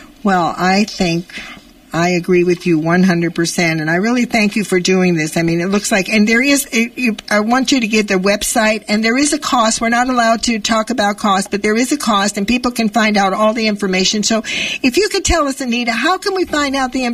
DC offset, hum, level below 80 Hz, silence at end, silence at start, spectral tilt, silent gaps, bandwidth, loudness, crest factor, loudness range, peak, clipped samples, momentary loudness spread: under 0.1%; none; -38 dBFS; 0 s; 0 s; -4 dB/octave; none; 15.5 kHz; -14 LUFS; 12 dB; 1 LU; -2 dBFS; under 0.1%; 4 LU